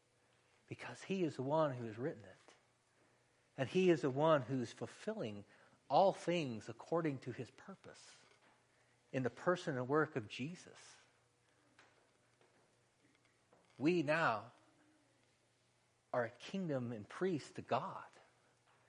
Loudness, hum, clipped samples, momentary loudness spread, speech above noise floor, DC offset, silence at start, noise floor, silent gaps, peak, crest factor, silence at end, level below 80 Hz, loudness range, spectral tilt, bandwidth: -39 LUFS; none; under 0.1%; 21 LU; 38 dB; under 0.1%; 0.7 s; -77 dBFS; none; -20 dBFS; 22 dB; 0.8 s; -84 dBFS; 7 LU; -6.5 dB/octave; 10.5 kHz